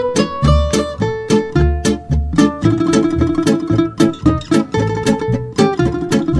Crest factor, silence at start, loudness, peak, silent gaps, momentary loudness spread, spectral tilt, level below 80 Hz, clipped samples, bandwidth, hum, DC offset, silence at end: 14 dB; 0 s; -15 LUFS; 0 dBFS; none; 4 LU; -6.5 dB/octave; -24 dBFS; under 0.1%; 11 kHz; none; under 0.1%; 0 s